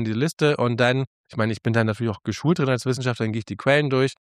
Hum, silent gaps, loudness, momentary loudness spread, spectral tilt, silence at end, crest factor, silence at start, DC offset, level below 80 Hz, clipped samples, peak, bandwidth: none; 1.07-1.24 s; -23 LUFS; 7 LU; -6 dB/octave; 0.25 s; 18 dB; 0 s; under 0.1%; -62 dBFS; under 0.1%; -4 dBFS; 13.5 kHz